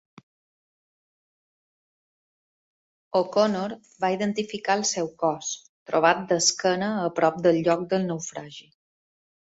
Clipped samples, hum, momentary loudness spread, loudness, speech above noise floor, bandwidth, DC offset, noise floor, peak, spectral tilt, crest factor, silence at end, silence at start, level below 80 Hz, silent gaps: under 0.1%; none; 12 LU; -24 LUFS; over 66 dB; 8.2 kHz; under 0.1%; under -90 dBFS; -4 dBFS; -3.5 dB/octave; 22 dB; 0.85 s; 3.15 s; -68 dBFS; 5.69-5.86 s